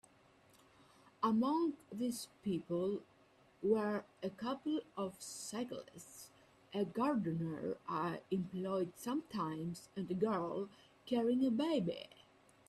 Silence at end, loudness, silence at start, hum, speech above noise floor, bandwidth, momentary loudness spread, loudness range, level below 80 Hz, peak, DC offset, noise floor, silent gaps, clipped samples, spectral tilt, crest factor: 0.65 s; -39 LUFS; 1.2 s; none; 29 dB; 14.5 kHz; 12 LU; 3 LU; -78 dBFS; -22 dBFS; under 0.1%; -68 dBFS; none; under 0.1%; -6 dB/octave; 18 dB